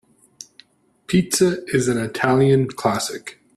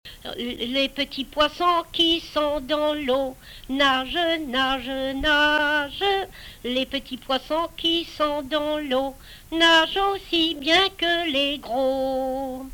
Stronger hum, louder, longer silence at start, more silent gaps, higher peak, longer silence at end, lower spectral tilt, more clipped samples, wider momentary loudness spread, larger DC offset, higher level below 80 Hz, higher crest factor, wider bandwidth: neither; first, -19 LUFS vs -22 LUFS; first, 0.4 s vs 0.05 s; neither; first, -2 dBFS vs -6 dBFS; first, 0.25 s vs 0 s; first, -5 dB/octave vs -3 dB/octave; neither; first, 20 LU vs 10 LU; neither; second, -54 dBFS vs -46 dBFS; about the same, 18 dB vs 18 dB; second, 14 kHz vs 20 kHz